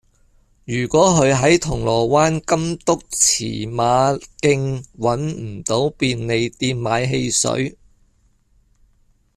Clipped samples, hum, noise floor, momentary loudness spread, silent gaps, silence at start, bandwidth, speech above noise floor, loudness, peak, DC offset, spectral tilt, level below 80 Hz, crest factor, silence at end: under 0.1%; none; -58 dBFS; 9 LU; none; 0.7 s; 14 kHz; 40 dB; -18 LUFS; -2 dBFS; under 0.1%; -4 dB/octave; -44 dBFS; 18 dB; 1.65 s